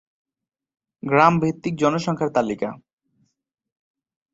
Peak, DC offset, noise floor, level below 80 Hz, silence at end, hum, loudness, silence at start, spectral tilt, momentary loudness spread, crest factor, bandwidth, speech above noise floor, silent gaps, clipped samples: -2 dBFS; under 0.1%; -68 dBFS; -60 dBFS; 1.55 s; none; -21 LUFS; 1.05 s; -6.5 dB/octave; 13 LU; 22 dB; 8 kHz; 48 dB; none; under 0.1%